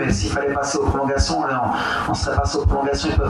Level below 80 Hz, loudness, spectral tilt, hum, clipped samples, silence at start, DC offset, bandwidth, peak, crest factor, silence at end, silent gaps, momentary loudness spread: -28 dBFS; -20 LUFS; -5 dB/octave; none; under 0.1%; 0 s; under 0.1%; 11.5 kHz; -6 dBFS; 14 dB; 0 s; none; 1 LU